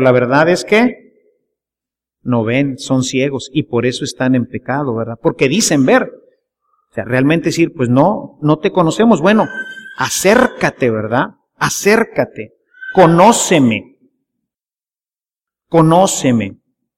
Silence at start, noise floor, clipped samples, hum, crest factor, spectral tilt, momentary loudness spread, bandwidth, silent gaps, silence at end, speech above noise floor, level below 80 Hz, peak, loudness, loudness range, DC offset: 0 s; under -90 dBFS; under 0.1%; none; 14 dB; -5 dB/octave; 10 LU; 16.5 kHz; none; 0.45 s; over 77 dB; -50 dBFS; 0 dBFS; -13 LUFS; 4 LU; under 0.1%